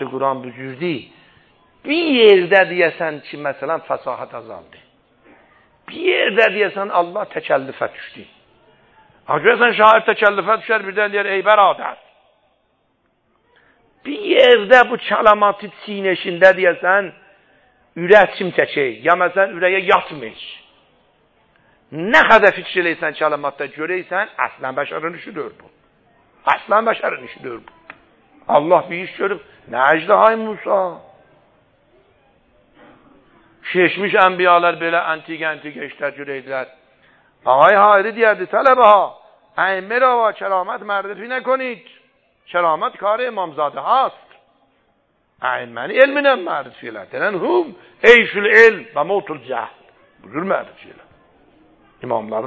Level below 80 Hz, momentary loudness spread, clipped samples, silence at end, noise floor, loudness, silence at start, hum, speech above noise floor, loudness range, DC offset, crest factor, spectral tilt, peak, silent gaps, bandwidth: -62 dBFS; 18 LU; under 0.1%; 0 s; -64 dBFS; -16 LUFS; 0 s; none; 48 dB; 8 LU; under 0.1%; 18 dB; -5.5 dB/octave; 0 dBFS; none; 7.6 kHz